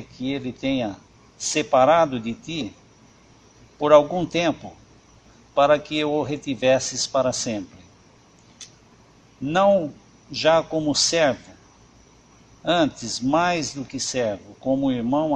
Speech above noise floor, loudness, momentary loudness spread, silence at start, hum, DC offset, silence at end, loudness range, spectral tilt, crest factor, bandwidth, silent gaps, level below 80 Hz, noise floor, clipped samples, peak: 32 dB; -22 LUFS; 16 LU; 0 s; none; under 0.1%; 0 s; 4 LU; -4 dB/octave; 22 dB; 11 kHz; none; -56 dBFS; -53 dBFS; under 0.1%; 0 dBFS